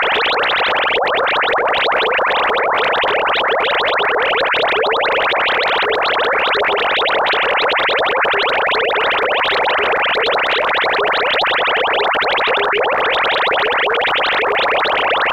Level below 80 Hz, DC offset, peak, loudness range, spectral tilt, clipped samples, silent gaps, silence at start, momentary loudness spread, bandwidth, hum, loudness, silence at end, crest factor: -50 dBFS; under 0.1%; -4 dBFS; 0 LU; -3 dB/octave; under 0.1%; none; 0 s; 1 LU; 15.5 kHz; none; -14 LUFS; 0 s; 12 dB